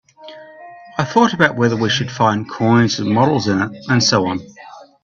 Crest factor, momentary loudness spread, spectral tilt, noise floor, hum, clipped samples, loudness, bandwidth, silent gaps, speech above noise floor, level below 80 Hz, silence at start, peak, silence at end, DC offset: 16 dB; 9 LU; -5 dB/octave; -40 dBFS; none; under 0.1%; -16 LUFS; 7.6 kHz; none; 24 dB; -52 dBFS; 0.2 s; 0 dBFS; 0.2 s; under 0.1%